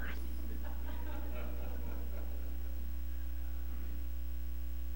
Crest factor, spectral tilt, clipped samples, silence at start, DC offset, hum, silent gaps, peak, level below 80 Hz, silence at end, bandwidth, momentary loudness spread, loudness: 10 dB; -6.5 dB/octave; under 0.1%; 0 s; 1%; none; none; -26 dBFS; -42 dBFS; 0 s; 16.5 kHz; 1 LU; -44 LUFS